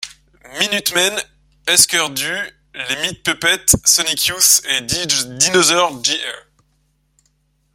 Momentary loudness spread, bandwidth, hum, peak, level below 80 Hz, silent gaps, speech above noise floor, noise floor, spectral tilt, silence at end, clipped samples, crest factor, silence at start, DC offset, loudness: 16 LU; 16.5 kHz; none; 0 dBFS; -46 dBFS; none; 46 dB; -62 dBFS; -0.5 dB/octave; 1.35 s; under 0.1%; 18 dB; 0 s; under 0.1%; -14 LUFS